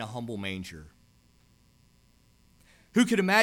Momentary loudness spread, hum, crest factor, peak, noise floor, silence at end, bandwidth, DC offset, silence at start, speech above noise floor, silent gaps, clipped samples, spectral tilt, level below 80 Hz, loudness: 19 LU; 60 Hz at -60 dBFS; 22 dB; -8 dBFS; -63 dBFS; 0 s; 17 kHz; under 0.1%; 0 s; 36 dB; none; under 0.1%; -4.5 dB/octave; -62 dBFS; -28 LUFS